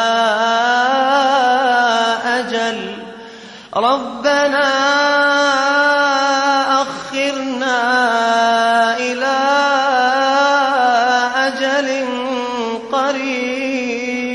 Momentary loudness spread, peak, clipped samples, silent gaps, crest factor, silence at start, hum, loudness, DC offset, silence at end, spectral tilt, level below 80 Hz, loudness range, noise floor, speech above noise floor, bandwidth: 7 LU; -2 dBFS; under 0.1%; none; 12 dB; 0 s; none; -15 LUFS; under 0.1%; 0 s; -2 dB/octave; -60 dBFS; 3 LU; -36 dBFS; 20 dB; 11.5 kHz